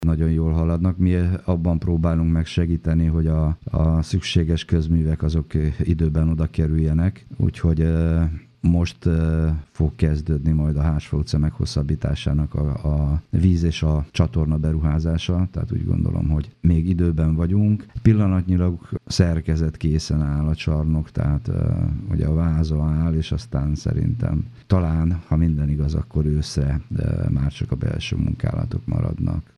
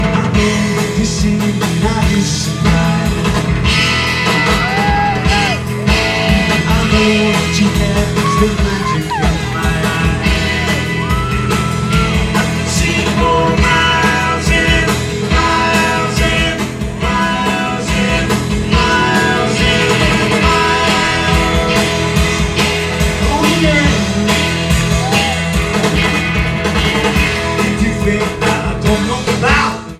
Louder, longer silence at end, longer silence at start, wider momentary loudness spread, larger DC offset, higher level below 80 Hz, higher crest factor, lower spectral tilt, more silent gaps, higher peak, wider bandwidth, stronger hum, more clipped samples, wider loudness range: second, -21 LUFS vs -13 LUFS; first, 0.15 s vs 0 s; about the same, 0 s vs 0 s; about the same, 5 LU vs 4 LU; neither; second, -28 dBFS vs -22 dBFS; first, 18 dB vs 12 dB; first, -8 dB/octave vs -4.5 dB/octave; neither; about the same, -2 dBFS vs 0 dBFS; second, 10 kHz vs 15.5 kHz; neither; neither; about the same, 2 LU vs 2 LU